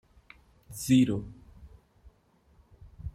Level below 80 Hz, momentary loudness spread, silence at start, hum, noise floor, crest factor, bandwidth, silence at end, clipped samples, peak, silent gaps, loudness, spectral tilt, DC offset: -52 dBFS; 22 LU; 0.7 s; none; -65 dBFS; 20 dB; 15.5 kHz; 0.05 s; under 0.1%; -12 dBFS; none; -27 LUFS; -6 dB/octave; under 0.1%